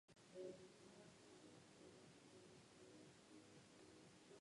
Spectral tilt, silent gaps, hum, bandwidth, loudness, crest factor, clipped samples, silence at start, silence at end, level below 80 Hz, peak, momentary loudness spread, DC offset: -4.5 dB/octave; none; none; 11 kHz; -64 LUFS; 20 dB; under 0.1%; 0.1 s; 0 s; -90 dBFS; -44 dBFS; 8 LU; under 0.1%